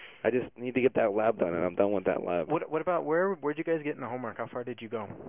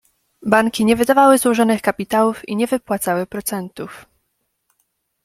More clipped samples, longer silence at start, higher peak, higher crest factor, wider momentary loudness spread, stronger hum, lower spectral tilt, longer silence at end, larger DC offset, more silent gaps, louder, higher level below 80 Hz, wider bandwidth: neither; second, 0 s vs 0.4 s; second, -12 dBFS vs 0 dBFS; about the same, 18 dB vs 18 dB; second, 10 LU vs 15 LU; neither; first, -10.5 dB/octave vs -4.5 dB/octave; second, 0 s vs 1.25 s; neither; neither; second, -30 LUFS vs -17 LUFS; second, -64 dBFS vs -54 dBFS; second, 3.7 kHz vs 16 kHz